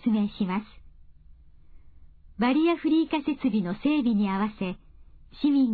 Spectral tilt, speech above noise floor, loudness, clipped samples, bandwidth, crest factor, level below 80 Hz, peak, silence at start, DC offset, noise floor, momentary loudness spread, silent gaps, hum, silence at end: -10 dB/octave; 26 dB; -26 LUFS; under 0.1%; 4.8 kHz; 14 dB; -52 dBFS; -12 dBFS; 0 s; under 0.1%; -51 dBFS; 8 LU; none; none; 0 s